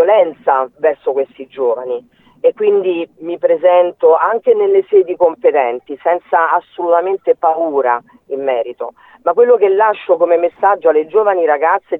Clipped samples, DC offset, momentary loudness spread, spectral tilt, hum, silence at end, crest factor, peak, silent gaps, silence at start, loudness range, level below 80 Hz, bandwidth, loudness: under 0.1%; under 0.1%; 10 LU; -7.5 dB/octave; none; 0 s; 12 dB; 0 dBFS; none; 0 s; 3 LU; -66 dBFS; 3.9 kHz; -14 LUFS